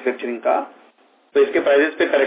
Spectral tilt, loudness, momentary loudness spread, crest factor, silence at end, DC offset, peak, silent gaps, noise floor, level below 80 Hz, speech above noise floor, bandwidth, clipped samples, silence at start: -7 dB/octave; -19 LUFS; 8 LU; 12 dB; 0 s; under 0.1%; -6 dBFS; none; -55 dBFS; -68 dBFS; 37 dB; 4 kHz; under 0.1%; 0 s